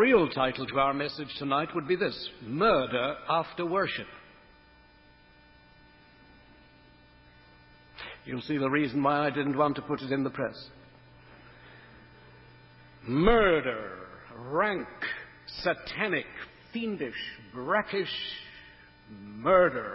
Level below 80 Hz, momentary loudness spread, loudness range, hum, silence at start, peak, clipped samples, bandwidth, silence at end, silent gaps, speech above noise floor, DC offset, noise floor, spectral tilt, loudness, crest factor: -52 dBFS; 20 LU; 9 LU; 60 Hz at -65 dBFS; 0 s; -8 dBFS; under 0.1%; 5.8 kHz; 0 s; none; 29 dB; under 0.1%; -58 dBFS; -9.5 dB/octave; -29 LUFS; 22 dB